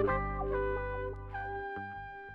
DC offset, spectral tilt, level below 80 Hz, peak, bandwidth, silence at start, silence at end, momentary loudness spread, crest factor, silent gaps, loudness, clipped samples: under 0.1%; -9 dB/octave; -44 dBFS; -20 dBFS; 5 kHz; 0 s; 0 s; 8 LU; 16 dB; none; -37 LUFS; under 0.1%